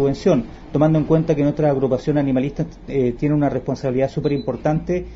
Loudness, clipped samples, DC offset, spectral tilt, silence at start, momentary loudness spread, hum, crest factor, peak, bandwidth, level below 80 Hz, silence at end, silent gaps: -20 LUFS; under 0.1%; under 0.1%; -8.5 dB/octave; 0 s; 5 LU; none; 16 dB; -4 dBFS; 7.6 kHz; -40 dBFS; 0 s; none